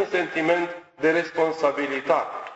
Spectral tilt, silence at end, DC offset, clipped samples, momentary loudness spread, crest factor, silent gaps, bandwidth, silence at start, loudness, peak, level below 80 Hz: -5 dB/octave; 0 s; under 0.1%; under 0.1%; 3 LU; 18 dB; none; 8.2 kHz; 0 s; -24 LUFS; -6 dBFS; -68 dBFS